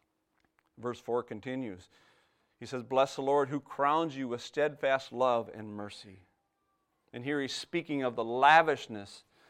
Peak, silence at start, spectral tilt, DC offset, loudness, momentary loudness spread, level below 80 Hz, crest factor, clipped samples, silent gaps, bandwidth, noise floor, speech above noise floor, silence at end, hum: -8 dBFS; 0.8 s; -5 dB/octave; under 0.1%; -30 LUFS; 18 LU; -76 dBFS; 24 dB; under 0.1%; none; 13.5 kHz; -78 dBFS; 47 dB; 0.3 s; none